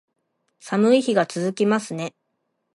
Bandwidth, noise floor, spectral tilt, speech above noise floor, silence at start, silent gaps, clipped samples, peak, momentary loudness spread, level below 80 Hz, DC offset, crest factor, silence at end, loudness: 11.5 kHz; -75 dBFS; -5.5 dB/octave; 54 dB; 0.65 s; none; under 0.1%; -6 dBFS; 13 LU; -74 dBFS; under 0.1%; 18 dB; 0.65 s; -21 LUFS